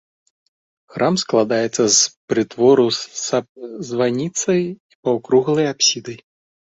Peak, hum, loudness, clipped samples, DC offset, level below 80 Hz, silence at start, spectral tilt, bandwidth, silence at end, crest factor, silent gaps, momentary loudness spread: -2 dBFS; none; -18 LUFS; under 0.1%; under 0.1%; -62 dBFS; 0.95 s; -3.5 dB/octave; 8 kHz; 0.6 s; 16 dB; 2.17-2.28 s, 3.49-3.55 s, 4.80-4.89 s, 4.95-5.03 s; 14 LU